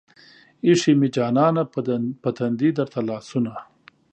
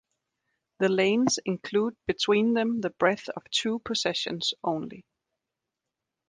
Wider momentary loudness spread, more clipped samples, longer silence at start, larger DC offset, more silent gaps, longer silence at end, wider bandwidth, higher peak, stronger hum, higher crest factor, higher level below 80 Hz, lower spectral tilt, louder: about the same, 9 LU vs 7 LU; neither; second, 0.65 s vs 0.8 s; neither; neither; second, 0.5 s vs 1.3 s; second, 9 kHz vs 10 kHz; first, -4 dBFS vs -8 dBFS; neither; about the same, 18 dB vs 20 dB; about the same, -68 dBFS vs -66 dBFS; first, -6.5 dB/octave vs -4 dB/octave; first, -22 LUFS vs -27 LUFS